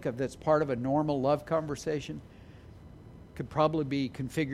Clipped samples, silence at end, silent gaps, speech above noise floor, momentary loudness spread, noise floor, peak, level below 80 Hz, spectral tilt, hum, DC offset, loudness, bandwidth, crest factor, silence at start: under 0.1%; 0 s; none; 20 dB; 21 LU; -50 dBFS; -12 dBFS; -56 dBFS; -7 dB/octave; none; under 0.1%; -30 LUFS; 15 kHz; 20 dB; 0 s